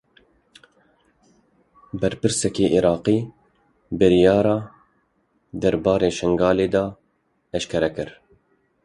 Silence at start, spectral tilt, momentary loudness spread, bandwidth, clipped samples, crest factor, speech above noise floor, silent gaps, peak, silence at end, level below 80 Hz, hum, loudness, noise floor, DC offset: 1.95 s; -5.5 dB/octave; 17 LU; 11.5 kHz; under 0.1%; 20 dB; 48 dB; none; -4 dBFS; 0.75 s; -48 dBFS; none; -20 LUFS; -68 dBFS; under 0.1%